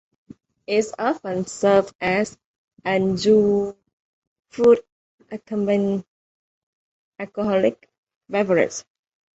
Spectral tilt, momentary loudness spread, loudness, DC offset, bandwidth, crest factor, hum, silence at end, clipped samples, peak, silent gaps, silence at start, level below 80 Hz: -5.5 dB/octave; 15 LU; -21 LUFS; under 0.1%; 8.2 kHz; 18 dB; none; 0.55 s; under 0.1%; -4 dBFS; 1.95-1.99 s, 2.46-2.68 s, 3.93-4.36 s, 4.92-5.18 s, 6.08-7.12 s, 7.98-8.03 s, 8.16-8.21 s; 0.7 s; -60 dBFS